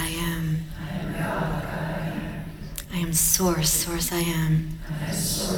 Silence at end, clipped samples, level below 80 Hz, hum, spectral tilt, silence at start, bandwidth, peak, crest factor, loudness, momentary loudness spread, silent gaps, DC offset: 0 s; under 0.1%; -38 dBFS; none; -4 dB/octave; 0 s; over 20 kHz; -6 dBFS; 20 dB; -25 LUFS; 13 LU; none; under 0.1%